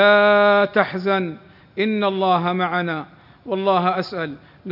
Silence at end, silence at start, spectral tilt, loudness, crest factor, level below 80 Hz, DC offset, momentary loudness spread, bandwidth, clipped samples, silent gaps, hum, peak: 0 s; 0 s; -7.5 dB/octave; -19 LUFS; 18 dB; -64 dBFS; under 0.1%; 16 LU; 5.8 kHz; under 0.1%; none; none; -2 dBFS